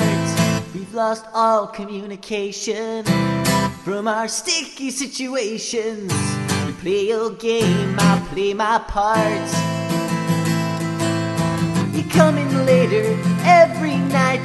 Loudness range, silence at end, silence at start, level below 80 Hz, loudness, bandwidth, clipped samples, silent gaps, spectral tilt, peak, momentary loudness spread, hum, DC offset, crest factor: 5 LU; 0 s; 0 s; -46 dBFS; -19 LUFS; 12.5 kHz; under 0.1%; none; -5 dB/octave; 0 dBFS; 9 LU; none; under 0.1%; 18 dB